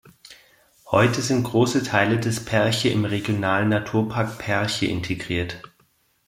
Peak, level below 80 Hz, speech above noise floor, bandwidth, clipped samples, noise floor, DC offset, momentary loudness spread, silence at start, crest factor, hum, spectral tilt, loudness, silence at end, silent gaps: -2 dBFS; -54 dBFS; 42 dB; 16 kHz; under 0.1%; -63 dBFS; under 0.1%; 7 LU; 0.3 s; 20 dB; none; -5 dB/octave; -22 LUFS; 0.6 s; none